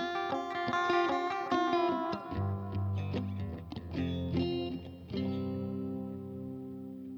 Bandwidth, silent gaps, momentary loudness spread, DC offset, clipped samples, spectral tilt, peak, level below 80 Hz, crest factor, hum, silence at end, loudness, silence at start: 7.2 kHz; none; 13 LU; under 0.1%; under 0.1%; -7 dB/octave; -18 dBFS; -56 dBFS; 16 dB; none; 0 s; -35 LUFS; 0 s